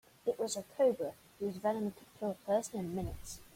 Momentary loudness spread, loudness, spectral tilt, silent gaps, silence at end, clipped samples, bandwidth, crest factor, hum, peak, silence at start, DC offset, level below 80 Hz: 10 LU; -37 LUFS; -5 dB/octave; none; 0.1 s; under 0.1%; 16.5 kHz; 18 dB; none; -20 dBFS; 0.25 s; under 0.1%; -58 dBFS